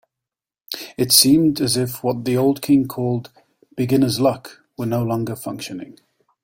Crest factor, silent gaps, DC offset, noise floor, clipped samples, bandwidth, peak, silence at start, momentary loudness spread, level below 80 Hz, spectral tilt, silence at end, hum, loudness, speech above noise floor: 20 dB; none; under 0.1%; -88 dBFS; under 0.1%; 16.5 kHz; 0 dBFS; 0.7 s; 18 LU; -56 dBFS; -4.5 dB/octave; 0.5 s; none; -18 LUFS; 69 dB